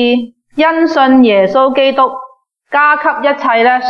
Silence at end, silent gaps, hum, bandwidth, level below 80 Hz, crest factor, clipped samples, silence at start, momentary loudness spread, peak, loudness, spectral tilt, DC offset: 0 s; none; none; 6.6 kHz; -56 dBFS; 10 dB; under 0.1%; 0 s; 8 LU; 0 dBFS; -10 LUFS; -5.5 dB/octave; under 0.1%